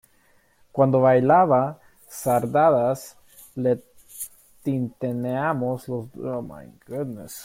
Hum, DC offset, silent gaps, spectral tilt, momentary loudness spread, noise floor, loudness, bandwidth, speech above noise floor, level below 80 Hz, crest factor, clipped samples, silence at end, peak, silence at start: none; under 0.1%; none; -7 dB/octave; 19 LU; -60 dBFS; -23 LUFS; 16.5 kHz; 38 dB; -62 dBFS; 18 dB; under 0.1%; 0 s; -6 dBFS; 0.75 s